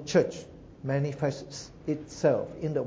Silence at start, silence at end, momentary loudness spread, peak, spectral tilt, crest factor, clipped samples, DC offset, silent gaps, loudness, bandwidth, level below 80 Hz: 0 s; 0 s; 14 LU; -10 dBFS; -6 dB/octave; 20 dB; under 0.1%; under 0.1%; none; -30 LUFS; 8 kHz; -58 dBFS